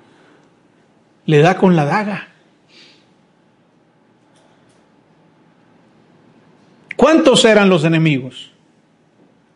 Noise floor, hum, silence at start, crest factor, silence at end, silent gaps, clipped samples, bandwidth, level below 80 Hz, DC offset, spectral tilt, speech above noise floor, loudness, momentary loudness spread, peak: -55 dBFS; none; 1.25 s; 18 dB; 1.15 s; none; under 0.1%; 11 kHz; -56 dBFS; under 0.1%; -5.5 dB/octave; 42 dB; -13 LUFS; 19 LU; 0 dBFS